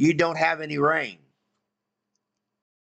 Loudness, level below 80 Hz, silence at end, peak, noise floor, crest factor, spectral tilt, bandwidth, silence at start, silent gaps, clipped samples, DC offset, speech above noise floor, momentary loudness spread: -23 LUFS; -66 dBFS; 1.75 s; -10 dBFS; -82 dBFS; 18 dB; -6 dB/octave; 8.4 kHz; 0 s; none; under 0.1%; under 0.1%; 60 dB; 5 LU